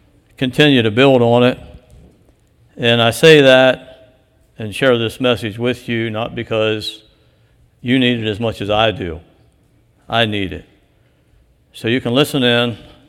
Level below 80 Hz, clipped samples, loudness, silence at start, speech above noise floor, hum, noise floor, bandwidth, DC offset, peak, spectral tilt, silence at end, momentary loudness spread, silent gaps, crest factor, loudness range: -48 dBFS; under 0.1%; -14 LUFS; 0.4 s; 41 dB; none; -55 dBFS; 16.5 kHz; under 0.1%; 0 dBFS; -5.5 dB/octave; 0.3 s; 16 LU; none; 16 dB; 8 LU